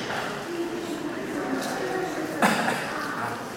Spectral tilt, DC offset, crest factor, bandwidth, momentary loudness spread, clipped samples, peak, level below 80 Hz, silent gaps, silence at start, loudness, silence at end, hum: -4 dB/octave; under 0.1%; 24 dB; 16.5 kHz; 8 LU; under 0.1%; -6 dBFS; -62 dBFS; none; 0 s; -28 LUFS; 0 s; none